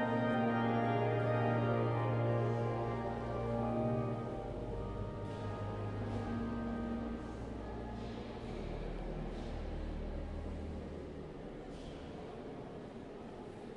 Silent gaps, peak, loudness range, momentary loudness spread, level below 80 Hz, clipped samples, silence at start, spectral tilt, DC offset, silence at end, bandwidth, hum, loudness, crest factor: none; -22 dBFS; 11 LU; 14 LU; -50 dBFS; under 0.1%; 0 s; -8.5 dB/octave; under 0.1%; 0 s; 9.4 kHz; none; -39 LUFS; 16 dB